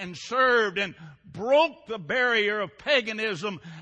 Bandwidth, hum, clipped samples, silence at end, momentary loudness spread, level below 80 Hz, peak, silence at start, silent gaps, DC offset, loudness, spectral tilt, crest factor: 9 kHz; none; under 0.1%; 0 s; 12 LU; -66 dBFS; -8 dBFS; 0 s; none; under 0.1%; -25 LUFS; -4 dB/octave; 18 dB